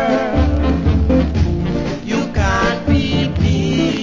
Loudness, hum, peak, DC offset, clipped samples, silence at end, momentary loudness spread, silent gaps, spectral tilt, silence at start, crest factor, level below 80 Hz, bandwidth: -16 LUFS; none; -2 dBFS; under 0.1%; under 0.1%; 0 s; 5 LU; none; -6.5 dB/octave; 0 s; 12 dB; -22 dBFS; 7.6 kHz